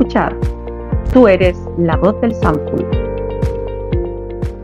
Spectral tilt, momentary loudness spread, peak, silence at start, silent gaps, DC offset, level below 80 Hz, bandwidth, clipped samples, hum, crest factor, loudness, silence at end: -8.5 dB/octave; 13 LU; 0 dBFS; 0 s; none; under 0.1%; -24 dBFS; 10.5 kHz; 0.1%; none; 14 dB; -16 LUFS; 0 s